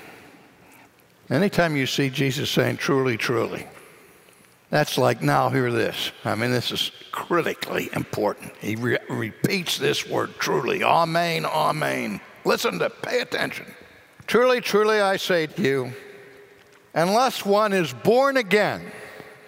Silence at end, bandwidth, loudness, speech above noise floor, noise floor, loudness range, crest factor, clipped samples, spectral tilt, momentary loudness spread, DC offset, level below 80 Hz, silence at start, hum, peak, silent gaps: 0.1 s; 16 kHz; -23 LUFS; 31 dB; -54 dBFS; 3 LU; 18 dB; under 0.1%; -4.5 dB/octave; 10 LU; under 0.1%; -62 dBFS; 0 s; none; -6 dBFS; none